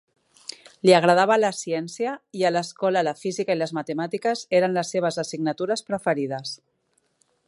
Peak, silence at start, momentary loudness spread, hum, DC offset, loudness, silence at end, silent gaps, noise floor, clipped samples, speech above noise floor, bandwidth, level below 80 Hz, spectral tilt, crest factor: -2 dBFS; 0.85 s; 13 LU; none; under 0.1%; -23 LUFS; 0.95 s; none; -70 dBFS; under 0.1%; 47 dB; 11.5 kHz; -72 dBFS; -4.5 dB/octave; 20 dB